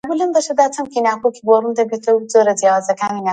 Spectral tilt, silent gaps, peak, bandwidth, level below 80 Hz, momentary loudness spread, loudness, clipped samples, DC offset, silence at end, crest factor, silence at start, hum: -4 dB/octave; none; 0 dBFS; 9.4 kHz; -66 dBFS; 6 LU; -16 LUFS; under 0.1%; under 0.1%; 0 s; 16 dB; 0.05 s; none